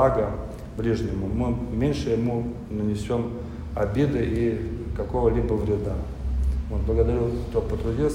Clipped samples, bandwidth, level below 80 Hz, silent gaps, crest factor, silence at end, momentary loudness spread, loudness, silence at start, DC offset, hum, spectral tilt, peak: under 0.1%; 11 kHz; -32 dBFS; none; 18 dB; 0 s; 8 LU; -26 LUFS; 0 s; under 0.1%; none; -8.5 dB/octave; -6 dBFS